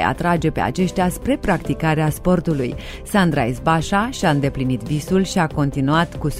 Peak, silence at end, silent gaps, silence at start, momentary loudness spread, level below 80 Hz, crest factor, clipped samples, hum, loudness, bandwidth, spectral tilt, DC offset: -2 dBFS; 0 s; none; 0 s; 4 LU; -34 dBFS; 16 dB; under 0.1%; none; -19 LUFS; 16 kHz; -6 dB/octave; under 0.1%